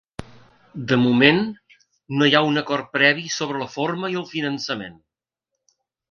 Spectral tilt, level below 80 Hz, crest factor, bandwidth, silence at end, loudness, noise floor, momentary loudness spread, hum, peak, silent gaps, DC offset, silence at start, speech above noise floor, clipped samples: -4.5 dB/octave; -58 dBFS; 22 dB; 7.2 kHz; 1.2 s; -20 LUFS; -83 dBFS; 17 LU; none; 0 dBFS; none; under 0.1%; 0.2 s; 62 dB; under 0.1%